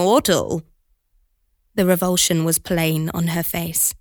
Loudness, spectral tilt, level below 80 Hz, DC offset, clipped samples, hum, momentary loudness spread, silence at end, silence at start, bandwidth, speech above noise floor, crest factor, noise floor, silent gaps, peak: -19 LUFS; -4 dB/octave; -48 dBFS; under 0.1%; under 0.1%; none; 7 LU; 0.05 s; 0 s; over 20 kHz; 46 dB; 18 dB; -65 dBFS; none; -2 dBFS